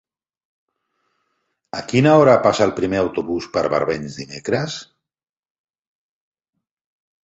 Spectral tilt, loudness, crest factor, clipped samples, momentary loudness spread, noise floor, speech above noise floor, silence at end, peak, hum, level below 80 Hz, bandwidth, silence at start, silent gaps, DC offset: -6 dB/octave; -18 LUFS; 20 dB; under 0.1%; 18 LU; -72 dBFS; 54 dB; 2.4 s; -2 dBFS; none; -54 dBFS; 8.2 kHz; 1.75 s; none; under 0.1%